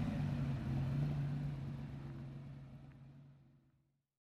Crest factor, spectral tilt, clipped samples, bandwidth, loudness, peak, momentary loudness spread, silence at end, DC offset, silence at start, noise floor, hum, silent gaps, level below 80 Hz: 14 dB; -9 dB/octave; under 0.1%; 6.6 kHz; -42 LUFS; -28 dBFS; 19 LU; 0.75 s; under 0.1%; 0 s; -78 dBFS; none; none; -56 dBFS